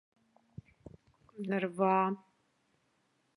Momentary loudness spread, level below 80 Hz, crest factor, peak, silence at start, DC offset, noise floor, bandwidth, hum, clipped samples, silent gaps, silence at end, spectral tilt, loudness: 26 LU; -72 dBFS; 20 dB; -16 dBFS; 1.35 s; under 0.1%; -76 dBFS; 10.5 kHz; none; under 0.1%; none; 1.2 s; -8 dB/octave; -33 LUFS